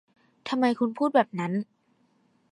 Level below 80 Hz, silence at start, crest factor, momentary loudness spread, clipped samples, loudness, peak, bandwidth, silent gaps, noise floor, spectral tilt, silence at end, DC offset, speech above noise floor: -82 dBFS; 0.45 s; 20 dB; 14 LU; under 0.1%; -26 LUFS; -8 dBFS; 11 kHz; none; -67 dBFS; -7 dB/octave; 0.9 s; under 0.1%; 42 dB